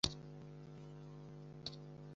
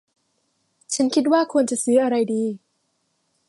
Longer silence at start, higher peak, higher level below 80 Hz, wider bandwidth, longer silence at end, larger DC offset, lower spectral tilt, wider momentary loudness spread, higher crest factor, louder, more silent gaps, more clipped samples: second, 0.05 s vs 0.9 s; second, -16 dBFS vs -6 dBFS; first, -62 dBFS vs -76 dBFS; second, 8 kHz vs 11.5 kHz; second, 0 s vs 0.9 s; neither; about the same, -4 dB/octave vs -4 dB/octave; second, 6 LU vs 10 LU; first, 32 dB vs 18 dB; second, -50 LUFS vs -20 LUFS; neither; neither